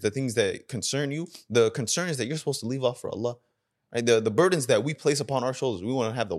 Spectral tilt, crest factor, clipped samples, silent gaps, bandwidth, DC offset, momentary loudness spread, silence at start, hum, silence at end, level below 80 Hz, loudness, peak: -4.5 dB/octave; 20 dB; under 0.1%; none; 13 kHz; under 0.1%; 9 LU; 0 s; none; 0 s; -68 dBFS; -26 LUFS; -8 dBFS